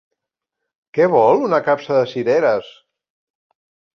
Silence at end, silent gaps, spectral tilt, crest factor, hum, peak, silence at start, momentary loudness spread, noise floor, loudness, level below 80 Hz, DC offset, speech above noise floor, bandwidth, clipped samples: 1.3 s; none; -7 dB/octave; 18 dB; none; -2 dBFS; 0.95 s; 6 LU; -81 dBFS; -17 LUFS; -66 dBFS; under 0.1%; 66 dB; 6.8 kHz; under 0.1%